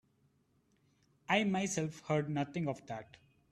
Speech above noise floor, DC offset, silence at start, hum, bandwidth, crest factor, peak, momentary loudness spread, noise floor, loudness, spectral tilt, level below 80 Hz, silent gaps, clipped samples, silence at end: 38 dB; under 0.1%; 1.3 s; none; 13.5 kHz; 22 dB; -16 dBFS; 15 LU; -74 dBFS; -35 LUFS; -5 dB/octave; -74 dBFS; none; under 0.1%; 0.5 s